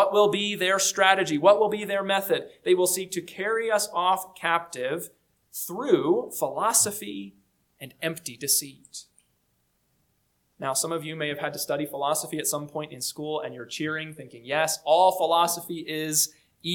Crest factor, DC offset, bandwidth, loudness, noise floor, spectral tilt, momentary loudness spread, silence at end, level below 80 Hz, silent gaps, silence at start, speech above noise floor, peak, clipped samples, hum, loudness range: 24 dB; under 0.1%; 19 kHz; -25 LUFS; -71 dBFS; -2.5 dB/octave; 15 LU; 0 s; -74 dBFS; none; 0 s; 46 dB; -4 dBFS; under 0.1%; none; 8 LU